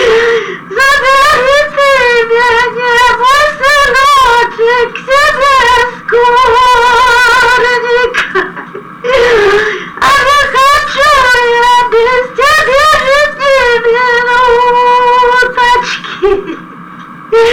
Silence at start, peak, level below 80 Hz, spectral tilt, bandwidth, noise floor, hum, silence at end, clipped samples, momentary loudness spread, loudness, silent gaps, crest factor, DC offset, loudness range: 0 s; -2 dBFS; -34 dBFS; -2 dB/octave; 20 kHz; -28 dBFS; none; 0 s; under 0.1%; 6 LU; -7 LUFS; none; 6 dB; 0.7%; 2 LU